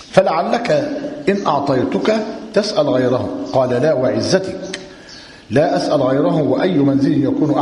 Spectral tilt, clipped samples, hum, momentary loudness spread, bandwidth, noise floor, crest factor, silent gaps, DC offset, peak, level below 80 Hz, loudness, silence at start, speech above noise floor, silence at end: -6.5 dB/octave; under 0.1%; none; 10 LU; 11 kHz; -38 dBFS; 16 dB; none; under 0.1%; 0 dBFS; -52 dBFS; -16 LUFS; 0 s; 23 dB; 0 s